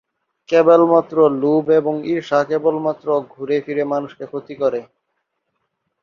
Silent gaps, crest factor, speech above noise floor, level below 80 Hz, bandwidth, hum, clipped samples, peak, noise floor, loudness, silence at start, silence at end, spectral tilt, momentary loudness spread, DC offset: none; 16 dB; 57 dB; -66 dBFS; 7 kHz; none; under 0.1%; -2 dBFS; -73 dBFS; -17 LUFS; 0.5 s; 1.2 s; -7.5 dB/octave; 11 LU; under 0.1%